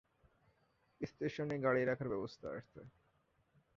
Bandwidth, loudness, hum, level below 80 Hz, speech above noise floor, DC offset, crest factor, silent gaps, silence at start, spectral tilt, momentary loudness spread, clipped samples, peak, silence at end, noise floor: 7.4 kHz; -40 LUFS; none; -72 dBFS; 38 dB; under 0.1%; 22 dB; none; 1 s; -6 dB/octave; 16 LU; under 0.1%; -20 dBFS; 0.9 s; -77 dBFS